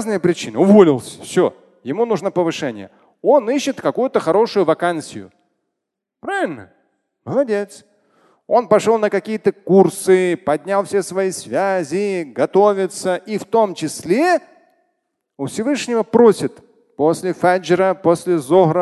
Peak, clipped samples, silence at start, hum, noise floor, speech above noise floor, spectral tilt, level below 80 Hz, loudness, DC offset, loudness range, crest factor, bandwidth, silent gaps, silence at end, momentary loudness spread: 0 dBFS; under 0.1%; 0 s; none; -80 dBFS; 64 dB; -5.5 dB/octave; -62 dBFS; -17 LUFS; under 0.1%; 5 LU; 16 dB; 12.5 kHz; none; 0 s; 11 LU